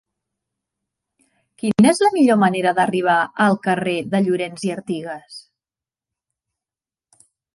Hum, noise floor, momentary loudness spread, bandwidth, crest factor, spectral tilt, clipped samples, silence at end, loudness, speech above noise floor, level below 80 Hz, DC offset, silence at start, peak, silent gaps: none; under -90 dBFS; 13 LU; 11.5 kHz; 18 dB; -5.5 dB/octave; under 0.1%; 2.15 s; -18 LUFS; over 72 dB; -64 dBFS; under 0.1%; 1.65 s; -2 dBFS; none